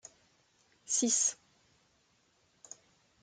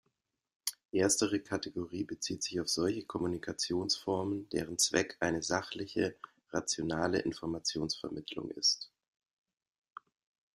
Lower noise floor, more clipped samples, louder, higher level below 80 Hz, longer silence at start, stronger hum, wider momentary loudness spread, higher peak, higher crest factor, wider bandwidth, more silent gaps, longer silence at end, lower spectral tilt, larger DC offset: second, -72 dBFS vs -82 dBFS; neither; first, -30 LUFS vs -34 LUFS; second, -84 dBFS vs -66 dBFS; first, 0.9 s vs 0.65 s; neither; first, 25 LU vs 10 LU; second, -18 dBFS vs -14 dBFS; about the same, 20 dB vs 22 dB; second, 10 kHz vs 15 kHz; second, none vs 0.85-0.89 s; first, 1.9 s vs 1.7 s; second, -0.5 dB/octave vs -3 dB/octave; neither